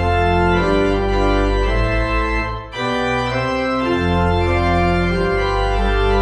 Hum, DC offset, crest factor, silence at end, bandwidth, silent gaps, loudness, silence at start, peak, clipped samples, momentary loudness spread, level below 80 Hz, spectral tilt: none; under 0.1%; 14 dB; 0 s; 10 kHz; none; -18 LUFS; 0 s; -2 dBFS; under 0.1%; 4 LU; -24 dBFS; -7 dB/octave